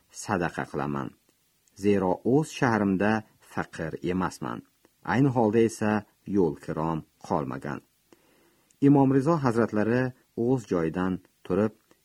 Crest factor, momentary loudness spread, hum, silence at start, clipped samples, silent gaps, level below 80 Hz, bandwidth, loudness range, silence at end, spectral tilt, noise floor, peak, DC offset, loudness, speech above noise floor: 20 dB; 13 LU; none; 0.15 s; under 0.1%; none; -58 dBFS; 13 kHz; 3 LU; 0.35 s; -7 dB/octave; -67 dBFS; -6 dBFS; under 0.1%; -27 LUFS; 41 dB